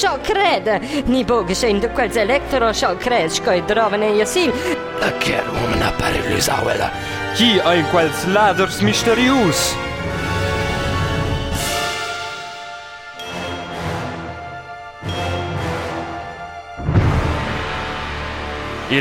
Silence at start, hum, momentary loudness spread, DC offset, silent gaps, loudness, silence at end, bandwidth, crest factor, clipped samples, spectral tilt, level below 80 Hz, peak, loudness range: 0 s; none; 14 LU; under 0.1%; none; -18 LUFS; 0 s; 17 kHz; 16 dB; under 0.1%; -4.5 dB/octave; -34 dBFS; -2 dBFS; 10 LU